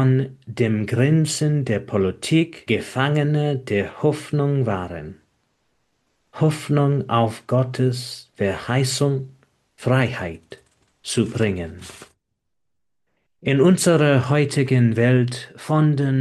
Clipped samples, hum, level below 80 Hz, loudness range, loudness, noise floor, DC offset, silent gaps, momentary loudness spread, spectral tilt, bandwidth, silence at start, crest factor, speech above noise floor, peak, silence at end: under 0.1%; none; -58 dBFS; 6 LU; -20 LUFS; -83 dBFS; under 0.1%; none; 13 LU; -6 dB/octave; 12.5 kHz; 0 s; 18 dB; 63 dB; -4 dBFS; 0 s